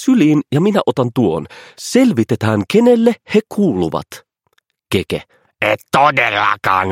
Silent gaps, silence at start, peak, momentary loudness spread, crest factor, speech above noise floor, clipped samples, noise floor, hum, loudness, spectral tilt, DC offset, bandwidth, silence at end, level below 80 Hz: none; 0 s; 0 dBFS; 12 LU; 14 dB; 49 dB; under 0.1%; -63 dBFS; none; -15 LUFS; -6 dB/octave; under 0.1%; 16.5 kHz; 0 s; -52 dBFS